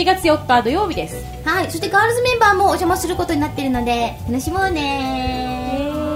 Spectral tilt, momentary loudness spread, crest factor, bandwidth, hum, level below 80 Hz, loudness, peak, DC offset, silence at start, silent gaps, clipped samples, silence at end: -4.5 dB/octave; 8 LU; 18 dB; 16 kHz; none; -34 dBFS; -18 LUFS; 0 dBFS; under 0.1%; 0 s; none; under 0.1%; 0 s